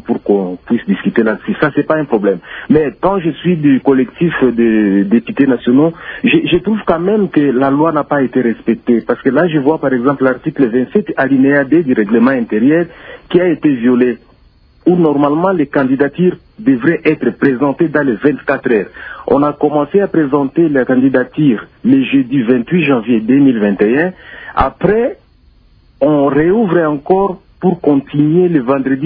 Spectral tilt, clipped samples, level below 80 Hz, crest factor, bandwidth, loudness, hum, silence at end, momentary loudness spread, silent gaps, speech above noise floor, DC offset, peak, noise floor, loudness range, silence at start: -11 dB/octave; under 0.1%; -42 dBFS; 12 dB; 4.7 kHz; -13 LUFS; none; 0 s; 5 LU; none; 35 dB; under 0.1%; 0 dBFS; -47 dBFS; 2 LU; 0.1 s